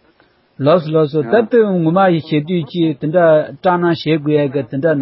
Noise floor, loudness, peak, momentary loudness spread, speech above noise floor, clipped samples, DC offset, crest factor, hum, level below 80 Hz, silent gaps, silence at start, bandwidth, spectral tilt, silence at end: -54 dBFS; -14 LUFS; 0 dBFS; 5 LU; 40 dB; under 0.1%; under 0.1%; 14 dB; none; -58 dBFS; none; 0.6 s; 5.8 kHz; -12.5 dB/octave; 0 s